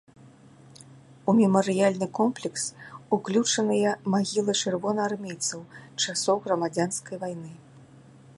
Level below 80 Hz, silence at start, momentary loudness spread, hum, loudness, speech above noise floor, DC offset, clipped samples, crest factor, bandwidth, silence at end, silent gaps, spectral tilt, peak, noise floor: -72 dBFS; 0.25 s; 13 LU; none; -26 LUFS; 26 dB; under 0.1%; under 0.1%; 20 dB; 11.5 kHz; 0.55 s; none; -4 dB/octave; -8 dBFS; -52 dBFS